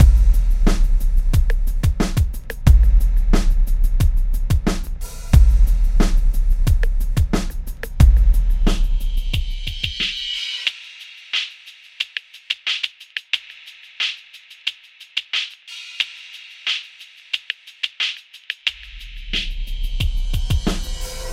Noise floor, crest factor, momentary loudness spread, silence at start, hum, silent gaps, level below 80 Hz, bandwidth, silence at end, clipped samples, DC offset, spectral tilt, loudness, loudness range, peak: -44 dBFS; 18 dB; 16 LU; 0 s; none; none; -18 dBFS; 15 kHz; 0 s; under 0.1%; under 0.1%; -5 dB/octave; -21 LUFS; 6 LU; 0 dBFS